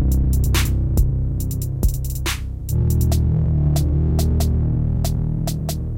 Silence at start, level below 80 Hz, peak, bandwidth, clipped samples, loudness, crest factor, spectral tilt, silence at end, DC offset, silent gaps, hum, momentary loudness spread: 0 s; -22 dBFS; -6 dBFS; 17 kHz; under 0.1%; -20 LUFS; 12 dB; -6 dB/octave; 0 s; under 0.1%; none; none; 6 LU